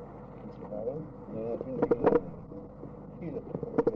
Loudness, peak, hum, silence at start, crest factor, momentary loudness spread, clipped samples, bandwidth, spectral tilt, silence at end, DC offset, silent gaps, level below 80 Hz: -33 LUFS; -12 dBFS; none; 0 s; 20 dB; 18 LU; under 0.1%; 5.6 kHz; -10.5 dB/octave; 0 s; under 0.1%; none; -56 dBFS